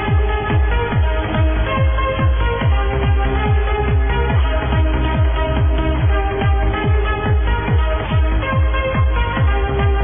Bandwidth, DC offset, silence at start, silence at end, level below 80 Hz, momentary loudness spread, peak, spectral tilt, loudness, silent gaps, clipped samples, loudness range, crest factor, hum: 3.7 kHz; under 0.1%; 0 s; 0 s; -18 dBFS; 1 LU; -6 dBFS; -11 dB/octave; -17 LUFS; none; under 0.1%; 0 LU; 10 dB; none